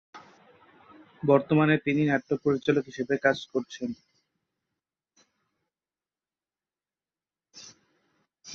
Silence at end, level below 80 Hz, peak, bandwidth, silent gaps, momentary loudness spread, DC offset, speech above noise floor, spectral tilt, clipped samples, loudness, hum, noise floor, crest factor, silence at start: 0 s; -68 dBFS; -8 dBFS; 7 kHz; none; 20 LU; under 0.1%; over 65 dB; -7 dB/octave; under 0.1%; -26 LUFS; none; under -90 dBFS; 22 dB; 0.15 s